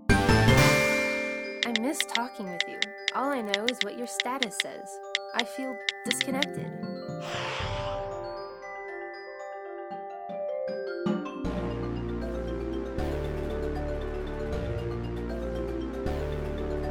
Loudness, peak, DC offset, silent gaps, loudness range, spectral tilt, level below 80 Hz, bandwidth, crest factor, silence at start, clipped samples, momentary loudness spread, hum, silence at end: -30 LUFS; -8 dBFS; under 0.1%; none; 8 LU; -4.5 dB/octave; -40 dBFS; over 20 kHz; 22 dB; 0 s; under 0.1%; 13 LU; none; 0 s